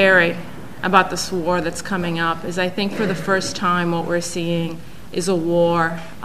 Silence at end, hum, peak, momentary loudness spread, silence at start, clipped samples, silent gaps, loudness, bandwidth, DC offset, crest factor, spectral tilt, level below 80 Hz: 0 s; none; 0 dBFS; 9 LU; 0 s; under 0.1%; none; -20 LUFS; 15 kHz; 2%; 20 dB; -4.5 dB/octave; -48 dBFS